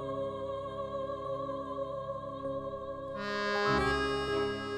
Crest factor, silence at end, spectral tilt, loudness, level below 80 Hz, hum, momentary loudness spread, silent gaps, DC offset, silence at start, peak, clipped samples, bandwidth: 18 dB; 0 s; -5.5 dB/octave; -35 LUFS; -52 dBFS; none; 10 LU; none; under 0.1%; 0 s; -16 dBFS; under 0.1%; 13 kHz